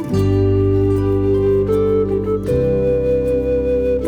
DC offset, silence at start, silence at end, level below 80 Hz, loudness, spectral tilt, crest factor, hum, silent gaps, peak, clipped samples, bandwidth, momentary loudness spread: under 0.1%; 0 s; 0 s; -30 dBFS; -17 LUFS; -9.5 dB/octave; 10 dB; none; none; -4 dBFS; under 0.1%; 9.6 kHz; 2 LU